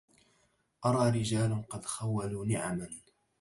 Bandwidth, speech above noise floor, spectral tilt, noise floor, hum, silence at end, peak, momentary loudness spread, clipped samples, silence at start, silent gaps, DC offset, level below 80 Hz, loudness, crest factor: 11.5 kHz; 41 dB; -6 dB/octave; -72 dBFS; none; 0.4 s; -16 dBFS; 10 LU; under 0.1%; 0.8 s; none; under 0.1%; -60 dBFS; -32 LUFS; 18 dB